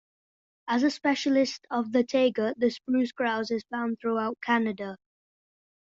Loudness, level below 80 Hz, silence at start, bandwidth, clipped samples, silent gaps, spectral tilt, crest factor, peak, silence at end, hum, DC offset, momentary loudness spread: -27 LUFS; -72 dBFS; 0.65 s; 7.8 kHz; under 0.1%; none; -4.5 dB/octave; 16 dB; -12 dBFS; 1 s; none; under 0.1%; 7 LU